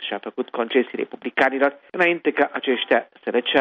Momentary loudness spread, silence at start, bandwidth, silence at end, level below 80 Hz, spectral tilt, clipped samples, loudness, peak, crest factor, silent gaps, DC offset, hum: 9 LU; 0 s; 7.8 kHz; 0 s; -72 dBFS; -5.5 dB/octave; under 0.1%; -22 LUFS; -4 dBFS; 18 dB; none; under 0.1%; none